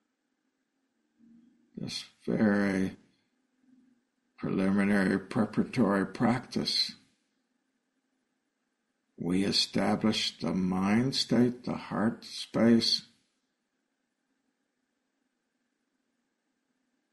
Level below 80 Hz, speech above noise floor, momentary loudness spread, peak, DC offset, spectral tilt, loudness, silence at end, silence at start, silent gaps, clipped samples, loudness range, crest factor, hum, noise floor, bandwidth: -64 dBFS; 52 dB; 11 LU; -12 dBFS; under 0.1%; -5 dB/octave; -29 LUFS; 4.1 s; 1.75 s; none; under 0.1%; 5 LU; 20 dB; none; -81 dBFS; 11.5 kHz